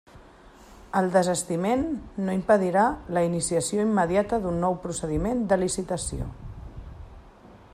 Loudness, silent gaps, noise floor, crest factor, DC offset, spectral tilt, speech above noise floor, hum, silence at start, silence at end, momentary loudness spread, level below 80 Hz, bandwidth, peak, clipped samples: -25 LUFS; none; -50 dBFS; 18 dB; under 0.1%; -5.5 dB/octave; 26 dB; none; 0.15 s; 0.15 s; 18 LU; -44 dBFS; 14.5 kHz; -8 dBFS; under 0.1%